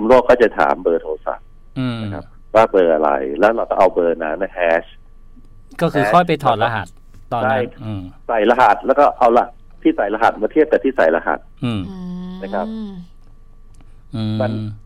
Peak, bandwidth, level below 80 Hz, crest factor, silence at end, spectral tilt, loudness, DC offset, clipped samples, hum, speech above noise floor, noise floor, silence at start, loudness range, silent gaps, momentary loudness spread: -2 dBFS; 13.5 kHz; -40 dBFS; 14 dB; 0.05 s; -7 dB/octave; -17 LUFS; under 0.1%; under 0.1%; none; 24 dB; -40 dBFS; 0 s; 5 LU; none; 16 LU